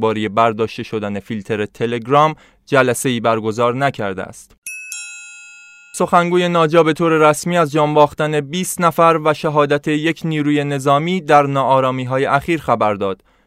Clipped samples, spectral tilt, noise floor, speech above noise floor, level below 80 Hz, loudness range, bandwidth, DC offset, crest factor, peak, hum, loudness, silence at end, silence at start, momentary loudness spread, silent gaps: under 0.1%; -5.5 dB/octave; -41 dBFS; 26 dB; -54 dBFS; 5 LU; 15.5 kHz; under 0.1%; 16 dB; 0 dBFS; none; -16 LUFS; 0.35 s; 0 s; 14 LU; 4.58-4.62 s